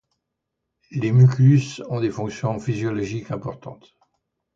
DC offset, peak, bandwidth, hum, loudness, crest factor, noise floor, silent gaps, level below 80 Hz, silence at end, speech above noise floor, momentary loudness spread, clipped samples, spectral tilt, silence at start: under 0.1%; -6 dBFS; 7.6 kHz; none; -21 LUFS; 16 dB; -80 dBFS; none; -56 dBFS; 0.8 s; 60 dB; 17 LU; under 0.1%; -8 dB/octave; 0.9 s